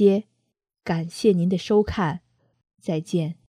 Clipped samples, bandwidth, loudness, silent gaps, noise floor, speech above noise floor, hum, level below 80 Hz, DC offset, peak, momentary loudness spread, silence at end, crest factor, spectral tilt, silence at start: under 0.1%; 11.5 kHz; -23 LUFS; none; -76 dBFS; 55 dB; none; -48 dBFS; under 0.1%; -6 dBFS; 12 LU; 0.25 s; 18 dB; -7 dB/octave; 0 s